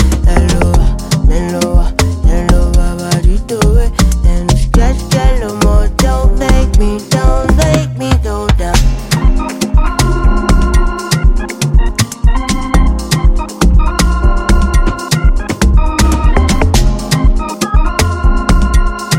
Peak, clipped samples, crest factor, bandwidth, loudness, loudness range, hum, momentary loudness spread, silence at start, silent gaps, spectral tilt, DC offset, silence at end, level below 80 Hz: 0 dBFS; under 0.1%; 10 dB; 15.5 kHz; -13 LUFS; 1 LU; none; 3 LU; 0 s; none; -5.5 dB/octave; 0.2%; 0 s; -10 dBFS